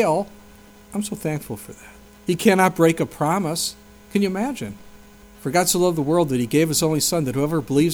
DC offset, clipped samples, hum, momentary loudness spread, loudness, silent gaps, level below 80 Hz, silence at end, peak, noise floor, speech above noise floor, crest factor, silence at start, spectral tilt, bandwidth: under 0.1%; under 0.1%; none; 15 LU; -21 LUFS; none; -52 dBFS; 0 s; -2 dBFS; -46 dBFS; 26 dB; 18 dB; 0 s; -4.5 dB/octave; over 20 kHz